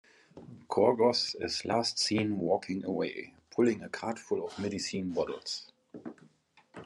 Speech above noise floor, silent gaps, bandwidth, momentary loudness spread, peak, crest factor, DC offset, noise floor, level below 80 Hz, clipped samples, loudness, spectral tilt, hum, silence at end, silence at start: 33 dB; none; 11.5 kHz; 20 LU; -12 dBFS; 20 dB; under 0.1%; -64 dBFS; -72 dBFS; under 0.1%; -31 LUFS; -4.5 dB/octave; none; 0 s; 0.35 s